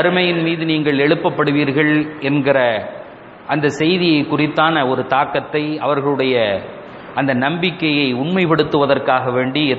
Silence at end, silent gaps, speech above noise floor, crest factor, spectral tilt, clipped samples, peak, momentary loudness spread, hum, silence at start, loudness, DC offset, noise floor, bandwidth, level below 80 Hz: 0 s; none; 20 dB; 16 dB; -7 dB/octave; under 0.1%; 0 dBFS; 7 LU; none; 0 s; -16 LUFS; under 0.1%; -36 dBFS; 8 kHz; -56 dBFS